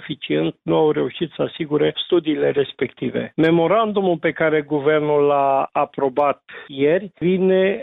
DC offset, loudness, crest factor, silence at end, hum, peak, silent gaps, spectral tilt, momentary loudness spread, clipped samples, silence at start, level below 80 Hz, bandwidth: under 0.1%; -19 LUFS; 12 dB; 0 s; none; -6 dBFS; none; -9 dB/octave; 8 LU; under 0.1%; 0 s; -60 dBFS; 4.1 kHz